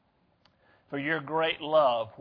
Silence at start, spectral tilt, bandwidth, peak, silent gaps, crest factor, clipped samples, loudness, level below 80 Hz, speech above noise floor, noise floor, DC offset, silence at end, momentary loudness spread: 0.9 s; -7.5 dB/octave; 5.2 kHz; -12 dBFS; none; 18 dB; under 0.1%; -27 LUFS; -74 dBFS; 40 dB; -67 dBFS; under 0.1%; 0.1 s; 9 LU